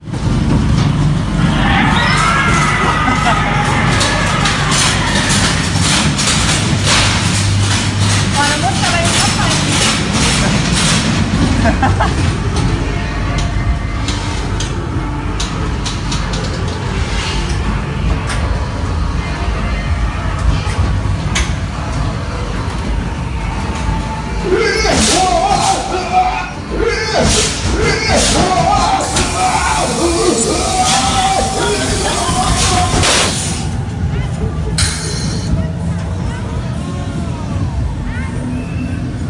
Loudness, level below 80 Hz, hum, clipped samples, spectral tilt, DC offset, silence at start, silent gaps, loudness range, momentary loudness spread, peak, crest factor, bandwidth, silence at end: -14 LUFS; -22 dBFS; none; under 0.1%; -4 dB/octave; under 0.1%; 0 s; none; 6 LU; 9 LU; 0 dBFS; 14 dB; 11.5 kHz; 0 s